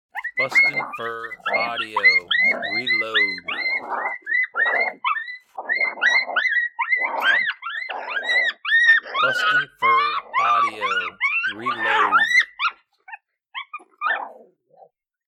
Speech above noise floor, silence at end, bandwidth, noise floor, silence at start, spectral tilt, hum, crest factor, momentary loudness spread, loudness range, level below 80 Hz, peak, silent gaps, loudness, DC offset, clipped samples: 33 dB; 0.95 s; 14 kHz; -54 dBFS; 0.15 s; -1.5 dB/octave; none; 16 dB; 12 LU; 3 LU; -72 dBFS; -6 dBFS; none; -19 LUFS; under 0.1%; under 0.1%